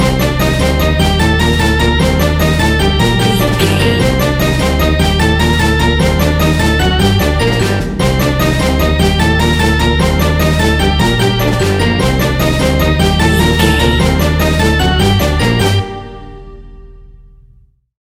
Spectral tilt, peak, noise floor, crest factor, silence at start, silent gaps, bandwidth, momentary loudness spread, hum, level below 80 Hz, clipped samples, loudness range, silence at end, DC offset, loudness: -5.5 dB/octave; 0 dBFS; -46 dBFS; 12 dB; 0 s; none; 16 kHz; 2 LU; none; -18 dBFS; under 0.1%; 1 LU; 0.9 s; under 0.1%; -11 LUFS